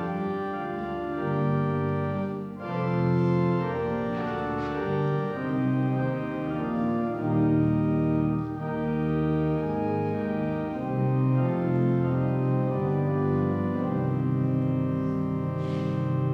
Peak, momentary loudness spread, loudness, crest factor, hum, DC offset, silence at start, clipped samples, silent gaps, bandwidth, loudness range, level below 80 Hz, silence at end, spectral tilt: -14 dBFS; 6 LU; -27 LUFS; 12 dB; none; under 0.1%; 0 s; under 0.1%; none; 5.6 kHz; 2 LU; -52 dBFS; 0 s; -10.5 dB/octave